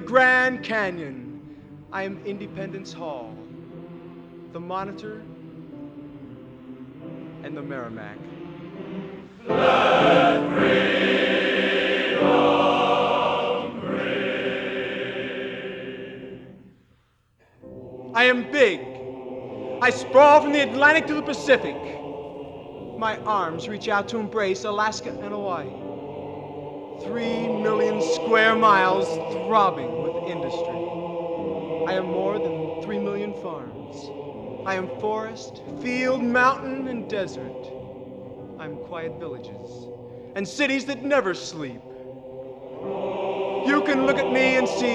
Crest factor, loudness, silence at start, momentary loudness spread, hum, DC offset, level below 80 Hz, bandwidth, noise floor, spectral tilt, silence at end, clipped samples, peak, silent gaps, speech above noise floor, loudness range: 20 dB; -22 LUFS; 0 s; 21 LU; none; under 0.1%; -60 dBFS; 9.8 kHz; -63 dBFS; -5 dB/octave; 0 s; under 0.1%; -4 dBFS; none; 40 dB; 16 LU